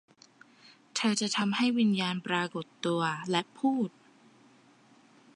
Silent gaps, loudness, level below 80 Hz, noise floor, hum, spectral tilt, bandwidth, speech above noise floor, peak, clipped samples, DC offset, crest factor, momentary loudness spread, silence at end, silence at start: none; -30 LUFS; -82 dBFS; -60 dBFS; none; -4 dB/octave; 11.5 kHz; 31 dB; -12 dBFS; under 0.1%; under 0.1%; 20 dB; 8 LU; 1.45 s; 0.95 s